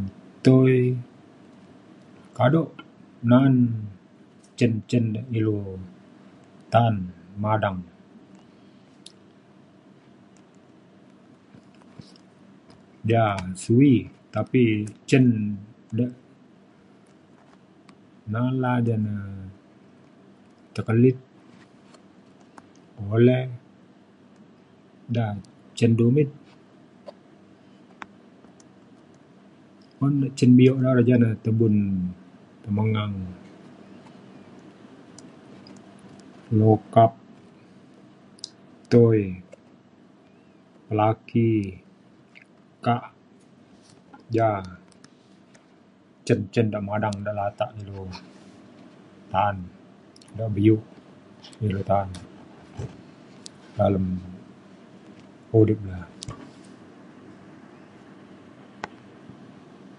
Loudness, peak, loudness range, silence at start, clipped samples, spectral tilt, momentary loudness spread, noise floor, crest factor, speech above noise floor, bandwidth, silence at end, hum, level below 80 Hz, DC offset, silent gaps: -23 LUFS; -2 dBFS; 10 LU; 0 s; under 0.1%; -8 dB/octave; 24 LU; -55 dBFS; 24 dB; 34 dB; 11 kHz; 0.65 s; none; -54 dBFS; under 0.1%; none